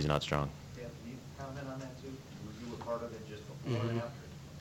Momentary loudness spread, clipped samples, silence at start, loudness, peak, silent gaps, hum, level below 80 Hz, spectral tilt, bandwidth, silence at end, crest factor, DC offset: 12 LU; under 0.1%; 0 s; -40 LUFS; -14 dBFS; none; none; -56 dBFS; -6 dB/octave; 16.5 kHz; 0 s; 26 dB; under 0.1%